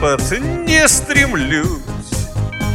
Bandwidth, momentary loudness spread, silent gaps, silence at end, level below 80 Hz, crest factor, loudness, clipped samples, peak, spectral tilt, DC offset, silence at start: 17.5 kHz; 12 LU; none; 0 s; -26 dBFS; 16 dB; -15 LUFS; under 0.1%; 0 dBFS; -3.5 dB/octave; under 0.1%; 0 s